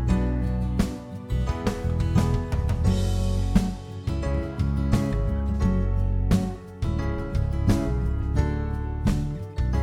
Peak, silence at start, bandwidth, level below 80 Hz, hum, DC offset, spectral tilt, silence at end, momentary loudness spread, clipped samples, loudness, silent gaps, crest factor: -6 dBFS; 0 s; 14 kHz; -28 dBFS; none; under 0.1%; -7.5 dB/octave; 0 s; 6 LU; under 0.1%; -26 LUFS; none; 18 dB